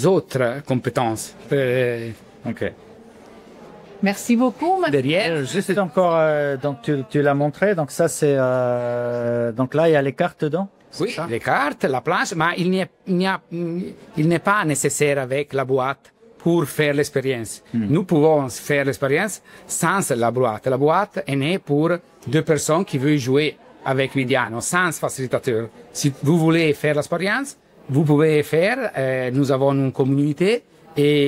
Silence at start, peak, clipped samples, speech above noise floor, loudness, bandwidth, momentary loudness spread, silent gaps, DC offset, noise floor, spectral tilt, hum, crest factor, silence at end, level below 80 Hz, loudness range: 0 s; -4 dBFS; under 0.1%; 24 dB; -20 LUFS; 16 kHz; 8 LU; none; under 0.1%; -44 dBFS; -5.5 dB/octave; none; 16 dB; 0 s; -60 dBFS; 3 LU